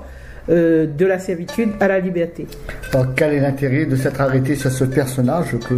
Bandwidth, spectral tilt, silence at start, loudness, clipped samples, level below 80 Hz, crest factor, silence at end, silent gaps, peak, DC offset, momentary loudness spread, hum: 15.5 kHz; -7 dB/octave; 0 s; -18 LUFS; under 0.1%; -40 dBFS; 16 dB; 0 s; none; -2 dBFS; under 0.1%; 8 LU; none